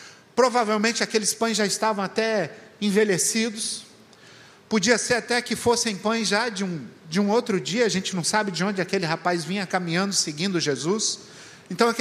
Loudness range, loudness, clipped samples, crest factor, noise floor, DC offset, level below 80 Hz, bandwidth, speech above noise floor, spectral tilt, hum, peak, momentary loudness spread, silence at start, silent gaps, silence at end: 2 LU; -23 LUFS; under 0.1%; 20 dB; -50 dBFS; under 0.1%; -66 dBFS; 15.5 kHz; 26 dB; -3 dB/octave; none; -4 dBFS; 8 LU; 0 s; none; 0 s